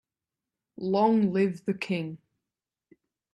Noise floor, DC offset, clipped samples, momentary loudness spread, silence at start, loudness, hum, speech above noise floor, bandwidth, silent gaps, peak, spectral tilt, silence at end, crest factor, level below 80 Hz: -90 dBFS; under 0.1%; under 0.1%; 15 LU; 0.8 s; -27 LUFS; none; 64 dB; 10 kHz; none; -12 dBFS; -8 dB/octave; 1.15 s; 18 dB; -72 dBFS